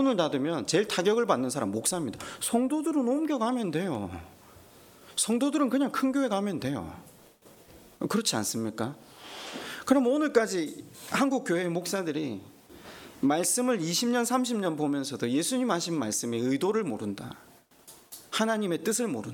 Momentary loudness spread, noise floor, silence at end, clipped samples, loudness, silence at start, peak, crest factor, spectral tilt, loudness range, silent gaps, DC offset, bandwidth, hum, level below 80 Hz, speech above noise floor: 13 LU; -55 dBFS; 0 s; under 0.1%; -28 LUFS; 0 s; -10 dBFS; 20 dB; -4 dB/octave; 3 LU; none; under 0.1%; 18.5 kHz; none; -66 dBFS; 27 dB